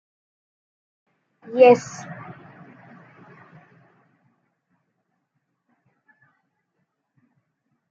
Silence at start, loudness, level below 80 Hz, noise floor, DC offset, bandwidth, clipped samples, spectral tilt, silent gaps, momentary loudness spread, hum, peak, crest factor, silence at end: 1.5 s; -17 LUFS; -78 dBFS; -75 dBFS; under 0.1%; 7.4 kHz; under 0.1%; -4.5 dB/octave; none; 28 LU; none; -2 dBFS; 24 dB; 5.8 s